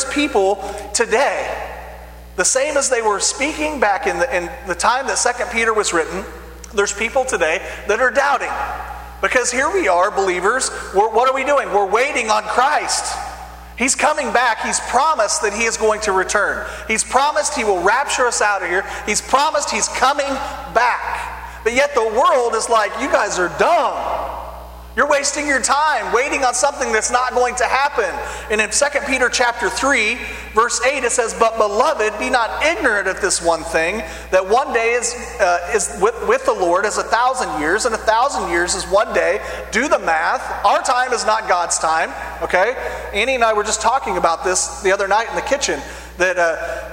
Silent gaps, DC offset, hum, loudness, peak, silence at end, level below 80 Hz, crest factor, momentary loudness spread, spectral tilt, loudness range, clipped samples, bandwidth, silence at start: none; under 0.1%; 60 Hz at -40 dBFS; -17 LUFS; 0 dBFS; 0 s; -40 dBFS; 18 dB; 8 LU; -1.5 dB/octave; 2 LU; under 0.1%; 16.5 kHz; 0 s